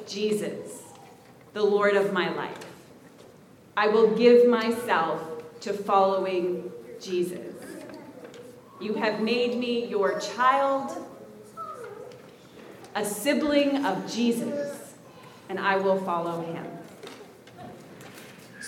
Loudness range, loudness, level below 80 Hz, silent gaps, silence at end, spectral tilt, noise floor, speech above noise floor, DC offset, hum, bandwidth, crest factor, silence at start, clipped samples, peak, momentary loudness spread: 8 LU; -25 LUFS; -72 dBFS; none; 0 s; -4.5 dB/octave; -52 dBFS; 27 dB; under 0.1%; none; 16.5 kHz; 20 dB; 0 s; under 0.1%; -6 dBFS; 23 LU